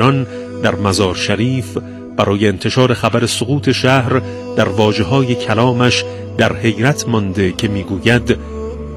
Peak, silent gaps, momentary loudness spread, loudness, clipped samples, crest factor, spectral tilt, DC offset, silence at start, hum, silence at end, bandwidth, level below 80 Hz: 0 dBFS; none; 7 LU; -15 LUFS; 0.3%; 14 dB; -5.5 dB/octave; under 0.1%; 0 s; none; 0 s; 13 kHz; -38 dBFS